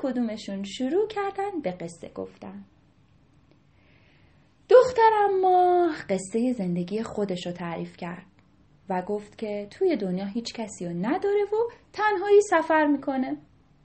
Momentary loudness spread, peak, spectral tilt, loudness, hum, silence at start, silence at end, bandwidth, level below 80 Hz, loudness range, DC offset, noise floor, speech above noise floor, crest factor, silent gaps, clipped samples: 18 LU; -6 dBFS; -6 dB/octave; -25 LUFS; none; 0 s; 0.45 s; 8.4 kHz; -64 dBFS; 10 LU; under 0.1%; -60 dBFS; 34 dB; 20 dB; none; under 0.1%